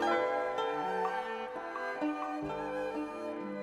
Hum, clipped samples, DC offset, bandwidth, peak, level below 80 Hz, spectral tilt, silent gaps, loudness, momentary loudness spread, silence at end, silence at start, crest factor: 50 Hz at -70 dBFS; under 0.1%; under 0.1%; 13.5 kHz; -20 dBFS; -66 dBFS; -5 dB/octave; none; -35 LUFS; 7 LU; 0 s; 0 s; 16 dB